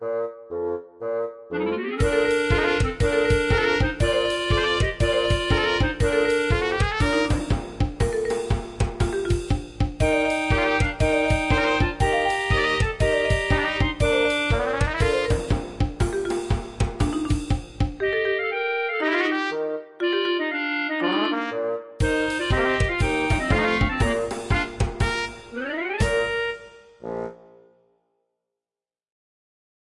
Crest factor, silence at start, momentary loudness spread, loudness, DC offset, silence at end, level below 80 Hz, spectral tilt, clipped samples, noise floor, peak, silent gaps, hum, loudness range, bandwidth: 18 dB; 0 s; 8 LU; -23 LUFS; under 0.1%; 2.5 s; -32 dBFS; -5.5 dB/octave; under 0.1%; under -90 dBFS; -6 dBFS; none; none; 5 LU; 11.5 kHz